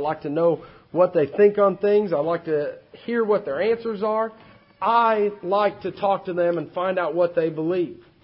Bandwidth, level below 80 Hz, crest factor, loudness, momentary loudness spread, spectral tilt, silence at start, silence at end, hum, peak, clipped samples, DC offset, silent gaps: 5.6 kHz; -64 dBFS; 18 dB; -22 LUFS; 8 LU; -11 dB/octave; 0 s; 0.3 s; none; -4 dBFS; under 0.1%; under 0.1%; none